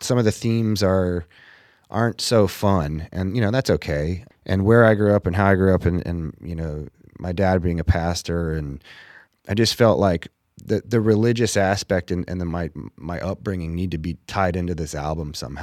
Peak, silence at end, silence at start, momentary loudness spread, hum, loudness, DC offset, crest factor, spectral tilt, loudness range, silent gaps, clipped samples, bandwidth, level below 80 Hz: -2 dBFS; 0 s; 0 s; 13 LU; none; -21 LUFS; under 0.1%; 20 dB; -6 dB/octave; 6 LU; none; under 0.1%; 15 kHz; -38 dBFS